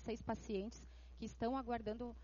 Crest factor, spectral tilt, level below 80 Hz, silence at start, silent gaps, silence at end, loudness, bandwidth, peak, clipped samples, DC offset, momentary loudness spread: 16 dB; -5.5 dB/octave; -58 dBFS; 0 s; none; 0 s; -45 LUFS; 7.2 kHz; -28 dBFS; under 0.1%; under 0.1%; 11 LU